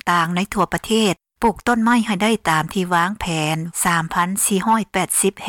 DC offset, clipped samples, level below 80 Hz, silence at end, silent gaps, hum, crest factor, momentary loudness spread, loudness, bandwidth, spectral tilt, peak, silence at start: under 0.1%; under 0.1%; -46 dBFS; 0 s; none; none; 14 dB; 4 LU; -19 LUFS; 18 kHz; -3.5 dB/octave; -6 dBFS; 0.05 s